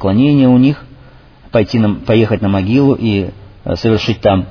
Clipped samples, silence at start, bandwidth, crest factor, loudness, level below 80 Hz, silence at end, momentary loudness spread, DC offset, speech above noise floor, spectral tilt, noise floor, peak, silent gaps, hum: under 0.1%; 0 s; 5.4 kHz; 12 dB; -13 LUFS; -38 dBFS; 0 s; 10 LU; under 0.1%; 28 dB; -8.5 dB/octave; -40 dBFS; 0 dBFS; none; none